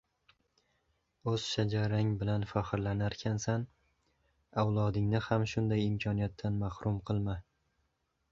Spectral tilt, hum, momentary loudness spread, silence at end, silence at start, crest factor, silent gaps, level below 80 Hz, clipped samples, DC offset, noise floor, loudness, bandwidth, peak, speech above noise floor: -6.5 dB/octave; none; 6 LU; 0.9 s; 1.25 s; 20 dB; none; -54 dBFS; under 0.1%; under 0.1%; -79 dBFS; -34 LUFS; 7.6 kHz; -14 dBFS; 47 dB